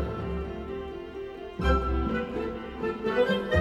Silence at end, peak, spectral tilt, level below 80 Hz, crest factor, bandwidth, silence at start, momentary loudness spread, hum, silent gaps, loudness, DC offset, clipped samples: 0 s; -12 dBFS; -7.5 dB/octave; -36 dBFS; 16 dB; 8.4 kHz; 0 s; 13 LU; none; none; -30 LUFS; under 0.1%; under 0.1%